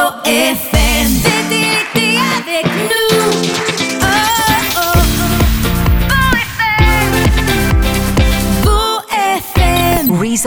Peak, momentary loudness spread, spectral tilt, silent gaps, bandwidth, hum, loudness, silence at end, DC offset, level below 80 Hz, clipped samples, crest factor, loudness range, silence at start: 0 dBFS; 3 LU; -4 dB/octave; none; 19.5 kHz; none; -12 LUFS; 0 s; under 0.1%; -18 dBFS; under 0.1%; 12 dB; 1 LU; 0 s